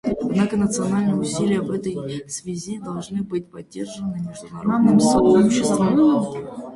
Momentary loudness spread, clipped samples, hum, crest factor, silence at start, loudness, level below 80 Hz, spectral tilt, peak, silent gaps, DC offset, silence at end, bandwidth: 15 LU; under 0.1%; none; 16 dB; 0.05 s; -20 LUFS; -50 dBFS; -6 dB/octave; -4 dBFS; none; under 0.1%; 0 s; 11.5 kHz